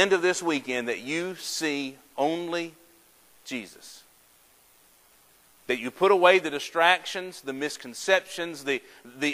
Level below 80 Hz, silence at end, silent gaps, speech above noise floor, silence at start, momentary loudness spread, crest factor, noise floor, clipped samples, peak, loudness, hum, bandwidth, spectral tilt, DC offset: -76 dBFS; 0 s; none; 33 dB; 0 s; 16 LU; 24 dB; -59 dBFS; under 0.1%; -4 dBFS; -26 LUFS; none; 16 kHz; -3 dB/octave; under 0.1%